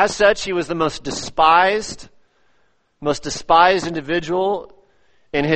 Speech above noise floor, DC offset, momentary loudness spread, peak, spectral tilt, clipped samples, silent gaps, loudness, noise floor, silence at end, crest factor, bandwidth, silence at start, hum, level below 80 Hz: 45 dB; under 0.1%; 13 LU; 0 dBFS; -4 dB/octave; under 0.1%; none; -18 LUFS; -62 dBFS; 0 s; 18 dB; 8.8 kHz; 0 s; none; -46 dBFS